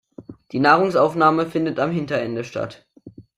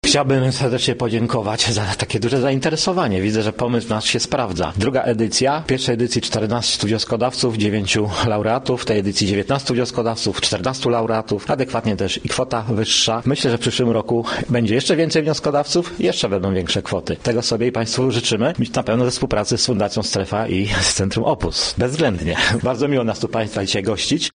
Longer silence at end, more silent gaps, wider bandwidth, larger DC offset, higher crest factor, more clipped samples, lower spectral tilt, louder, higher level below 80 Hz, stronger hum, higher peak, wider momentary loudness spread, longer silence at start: about the same, 0.15 s vs 0.05 s; neither; first, 13 kHz vs 10 kHz; neither; about the same, 18 dB vs 16 dB; neither; first, -6.5 dB/octave vs -4.5 dB/octave; about the same, -20 LUFS vs -19 LUFS; second, -62 dBFS vs -42 dBFS; neither; about the same, -2 dBFS vs -2 dBFS; first, 14 LU vs 4 LU; first, 0.2 s vs 0.05 s